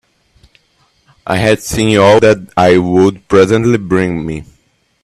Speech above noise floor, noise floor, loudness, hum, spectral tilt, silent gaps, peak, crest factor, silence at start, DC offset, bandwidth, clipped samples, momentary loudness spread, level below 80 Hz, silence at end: 46 dB; -56 dBFS; -11 LUFS; none; -6 dB/octave; none; 0 dBFS; 12 dB; 1.25 s; under 0.1%; 14.5 kHz; under 0.1%; 12 LU; -40 dBFS; 0.6 s